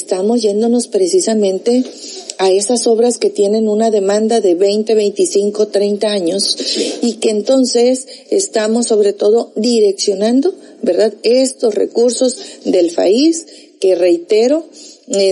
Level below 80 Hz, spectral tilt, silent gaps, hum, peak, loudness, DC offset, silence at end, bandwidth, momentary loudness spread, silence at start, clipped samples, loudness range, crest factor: -80 dBFS; -3.5 dB/octave; none; none; 0 dBFS; -13 LUFS; under 0.1%; 0 s; 11.5 kHz; 5 LU; 0 s; under 0.1%; 1 LU; 12 dB